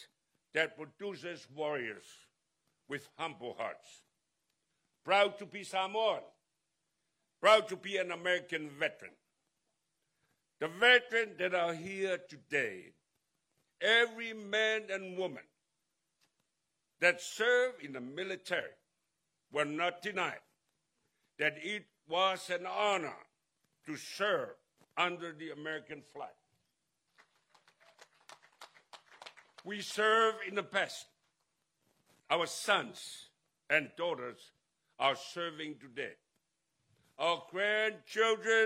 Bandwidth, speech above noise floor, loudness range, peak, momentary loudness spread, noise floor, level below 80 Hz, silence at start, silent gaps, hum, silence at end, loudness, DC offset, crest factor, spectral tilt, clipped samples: 16 kHz; 51 dB; 9 LU; -12 dBFS; 18 LU; -85 dBFS; -86 dBFS; 0 s; none; none; 0 s; -34 LUFS; under 0.1%; 24 dB; -2.5 dB/octave; under 0.1%